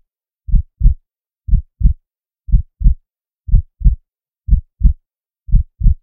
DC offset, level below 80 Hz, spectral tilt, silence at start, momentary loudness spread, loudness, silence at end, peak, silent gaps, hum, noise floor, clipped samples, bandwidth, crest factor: under 0.1%; -16 dBFS; -15.5 dB/octave; 0.5 s; 12 LU; -19 LUFS; 0.05 s; 0 dBFS; none; none; -67 dBFS; 0.2%; 0.5 kHz; 14 dB